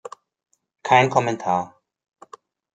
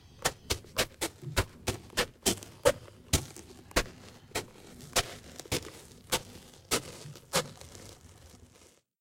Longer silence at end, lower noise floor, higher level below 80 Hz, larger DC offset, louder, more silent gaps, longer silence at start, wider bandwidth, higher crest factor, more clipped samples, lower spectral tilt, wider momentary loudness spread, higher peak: first, 1.05 s vs 0.55 s; second, -49 dBFS vs -61 dBFS; second, -66 dBFS vs -48 dBFS; neither; first, -20 LUFS vs -33 LUFS; neither; first, 0.85 s vs 0.15 s; second, 9.2 kHz vs 16.5 kHz; second, 22 dB vs 28 dB; neither; first, -5 dB/octave vs -2.5 dB/octave; about the same, 20 LU vs 20 LU; first, -2 dBFS vs -8 dBFS